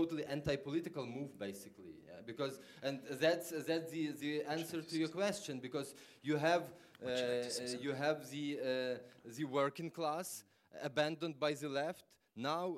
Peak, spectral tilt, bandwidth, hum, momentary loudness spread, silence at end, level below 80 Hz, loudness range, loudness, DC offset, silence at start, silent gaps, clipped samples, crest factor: -20 dBFS; -4.5 dB/octave; 16 kHz; none; 13 LU; 0 s; -74 dBFS; 2 LU; -40 LUFS; under 0.1%; 0 s; none; under 0.1%; 20 dB